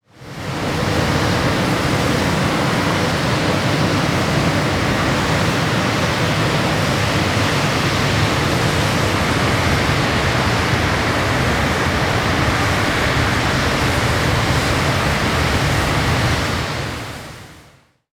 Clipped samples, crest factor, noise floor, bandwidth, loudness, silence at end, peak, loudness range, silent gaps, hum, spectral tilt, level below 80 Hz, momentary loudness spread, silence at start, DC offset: under 0.1%; 14 dB; -50 dBFS; 19.5 kHz; -17 LUFS; 0.5 s; -4 dBFS; 1 LU; none; none; -4.5 dB/octave; -30 dBFS; 2 LU; 0.2 s; under 0.1%